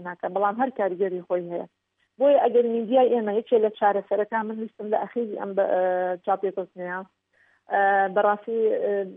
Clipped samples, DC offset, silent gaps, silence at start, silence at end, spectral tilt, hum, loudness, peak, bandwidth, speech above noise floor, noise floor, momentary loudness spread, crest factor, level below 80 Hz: under 0.1%; under 0.1%; none; 0 s; 0 s; -9.5 dB/octave; none; -24 LUFS; -8 dBFS; 3.8 kHz; 41 dB; -64 dBFS; 12 LU; 16 dB; -84 dBFS